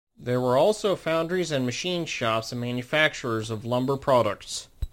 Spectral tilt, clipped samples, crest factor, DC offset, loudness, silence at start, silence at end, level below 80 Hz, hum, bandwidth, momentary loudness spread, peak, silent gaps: -4.5 dB/octave; under 0.1%; 20 dB; under 0.1%; -25 LUFS; 0.2 s; 0.05 s; -46 dBFS; none; 16.5 kHz; 8 LU; -6 dBFS; none